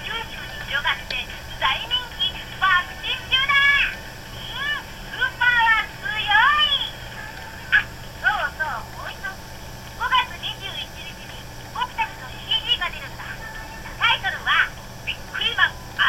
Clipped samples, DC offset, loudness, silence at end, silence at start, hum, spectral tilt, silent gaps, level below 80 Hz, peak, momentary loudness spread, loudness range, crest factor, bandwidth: under 0.1%; under 0.1%; -21 LUFS; 0 s; 0 s; none; -2 dB/octave; none; -42 dBFS; -4 dBFS; 18 LU; 7 LU; 20 dB; 16.5 kHz